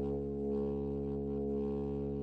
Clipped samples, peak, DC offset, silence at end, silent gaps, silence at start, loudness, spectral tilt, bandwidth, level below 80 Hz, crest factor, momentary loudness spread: under 0.1%; -26 dBFS; under 0.1%; 0 s; none; 0 s; -37 LUFS; -11.5 dB/octave; 4.8 kHz; -48 dBFS; 10 dB; 2 LU